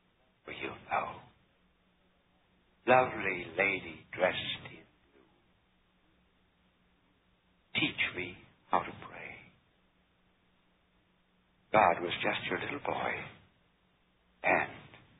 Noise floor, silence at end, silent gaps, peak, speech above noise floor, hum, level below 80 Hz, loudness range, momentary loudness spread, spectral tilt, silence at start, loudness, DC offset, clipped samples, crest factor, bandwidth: -71 dBFS; 0.25 s; none; -12 dBFS; 40 dB; none; -68 dBFS; 8 LU; 19 LU; 0.5 dB/octave; 0.45 s; -32 LUFS; under 0.1%; under 0.1%; 24 dB; 3.9 kHz